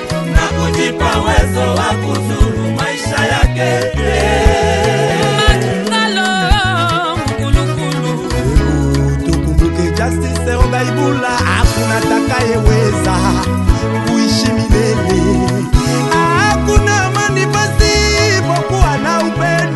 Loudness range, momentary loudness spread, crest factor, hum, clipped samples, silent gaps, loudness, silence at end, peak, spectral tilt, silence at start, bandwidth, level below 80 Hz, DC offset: 2 LU; 4 LU; 12 dB; none; 0.1%; none; -13 LUFS; 0 s; 0 dBFS; -5 dB/octave; 0 s; 12.5 kHz; -20 dBFS; under 0.1%